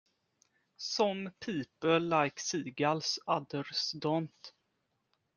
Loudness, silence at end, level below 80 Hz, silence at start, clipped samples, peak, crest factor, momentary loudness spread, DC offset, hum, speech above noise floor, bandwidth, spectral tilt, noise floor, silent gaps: -33 LUFS; 0.9 s; -76 dBFS; 0.8 s; under 0.1%; -14 dBFS; 22 dB; 10 LU; under 0.1%; none; 47 dB; 10.5 kHz; -4 dB/octave; -80 dBFS; none